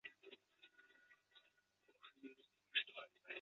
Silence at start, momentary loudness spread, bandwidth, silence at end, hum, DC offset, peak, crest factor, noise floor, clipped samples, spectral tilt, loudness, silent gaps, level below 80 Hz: 0.05 s; 26 LU; 7.2 kHz; 0 s; none; under 0.1%; -28 dBFS; 28 dB; -79 dBFS; under 0.1%; 3.5 dB/octave; -47 LUFS; none; under -90 dBFS